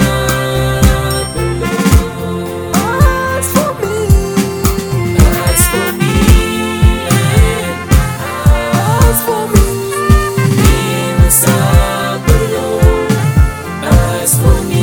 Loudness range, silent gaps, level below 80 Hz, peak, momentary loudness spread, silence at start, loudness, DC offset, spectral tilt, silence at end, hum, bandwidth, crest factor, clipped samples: 2 LU; none; -16 dBFS; 0 dBFS; 6 LU; 0 s; -12 LUFS; under 0.1%; -5 dB/octave; 0 s; none; 20 kHz; 10 dB; 1%